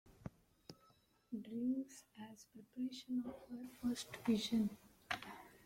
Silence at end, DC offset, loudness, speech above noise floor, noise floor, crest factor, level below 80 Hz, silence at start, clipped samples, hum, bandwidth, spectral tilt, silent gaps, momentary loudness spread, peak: 0.1 s; under 0.1%; -43 LUFS; 31 dB; -73 dBFS; 22 dB; -74 dBFS; 0.05 s; under 0.1%; none; 16.5 kHz; -4.5 dB/octave; none; 21 LU; -22 dBFS